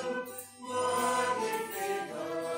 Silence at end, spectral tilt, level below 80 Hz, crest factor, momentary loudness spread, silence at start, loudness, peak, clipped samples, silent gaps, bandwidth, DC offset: 0 s; -2.5 dB/octave; -80 dBFS; 14 dB; 9 LU; 0 s; -33 LUFS; -18 dBFS; under 0.1%; none; 16 kHz; under 0.1%